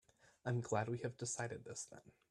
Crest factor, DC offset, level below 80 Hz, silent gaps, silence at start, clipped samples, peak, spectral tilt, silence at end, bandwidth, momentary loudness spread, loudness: 22 dB; under 0.1%; -76 dBFS; none; 0.45 s; under 0.1%; -22 dBFS; -5 dB/octave; 0.2 s; 12 kHz; 11 LU; -43 LUFS